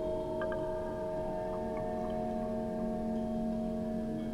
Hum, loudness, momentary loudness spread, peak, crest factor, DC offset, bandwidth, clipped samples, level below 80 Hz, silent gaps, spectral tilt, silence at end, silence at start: none; -36 LUFS; 2 LU; -24 dBFS; 10 dB; under 0.1%; 12 kHz; under 0.1%; -48 dBFS; none; -8 dB/octave; 0 s; 0 s